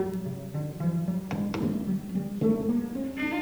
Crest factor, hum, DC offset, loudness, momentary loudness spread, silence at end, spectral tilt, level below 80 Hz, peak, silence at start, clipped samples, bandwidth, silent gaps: 16 dB; none; under 0.1%; -30 LUFS; 8 LU; 0 s; -8 dB/octave; -56 dBFS; -14 dBFS; 0 s; under 0.1%; over 20 kHz; none